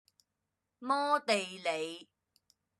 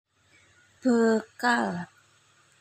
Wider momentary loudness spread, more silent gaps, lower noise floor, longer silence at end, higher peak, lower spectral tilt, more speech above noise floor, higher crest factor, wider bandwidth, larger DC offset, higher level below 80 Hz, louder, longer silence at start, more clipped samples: about the same, 15 LU vs 13 LU; neither; first, -86 dBFS vs -62 dBFS; about the same, 0.75 s vs 0.75 s; second, -14 dBFS vs -10 dBFS; second, -2.5 dB/octave vs -5 dB/octave; first, 53 dB vs 37 dB; about the same, 22 dB vs 18 dB; second, 12.5 kHz vs 15.5 kHz; neither; second, under -90 dBFS vs -78 dBFS; second, -33 LUFS vs -26 LUFS; about the same, 0.8 s vs 0.85 s; neither